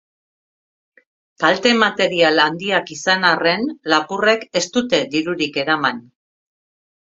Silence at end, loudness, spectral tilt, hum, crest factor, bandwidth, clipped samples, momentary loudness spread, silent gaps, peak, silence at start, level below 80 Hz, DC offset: 1 s; -17 LUFS; -3.5 dB/octave; none; 20 dB; 7.8 kHz; under 0.1%; 6 LU; none; 0 dBFS; 1.4 s; -64 dBFS; under 0.1%